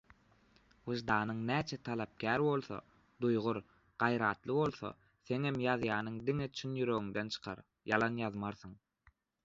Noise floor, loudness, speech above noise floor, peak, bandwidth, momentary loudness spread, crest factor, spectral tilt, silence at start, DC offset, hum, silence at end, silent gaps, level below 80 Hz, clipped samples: -71 dBFS; -36 LUFS; 36 dB; -14 dBFS; 7.6 kHz; 14 LU; 24 dB; -4.5 dB/octave; 0.85 s; under 0.1%; none; 0.7 s; none; -68 dBFS; under 0.1%